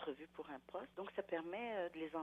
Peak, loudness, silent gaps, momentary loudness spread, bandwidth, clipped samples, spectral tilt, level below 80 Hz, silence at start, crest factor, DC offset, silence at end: -30 dBFS; -47 LUFS; none; 8 LU; 13.5 kHz; under 0.1%; -6.5 dB/octave; -80 dBFS; 0 s; 18 dB; under 0.1%; 0 s